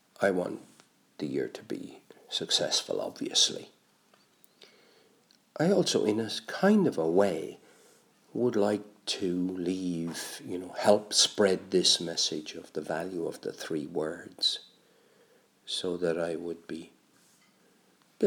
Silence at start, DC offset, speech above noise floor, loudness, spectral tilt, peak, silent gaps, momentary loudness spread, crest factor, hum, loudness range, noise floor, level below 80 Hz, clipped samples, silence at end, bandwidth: 0.2 s; under 0.1%; 36 dB; -29 LUFS; -3.5 dB/octave; -8 dBFS; none; 15 LU; 24 dB; none; 7 LU; -65 dBFS; -76 dBFS; under 0.1%; 0 s; over 20 kHz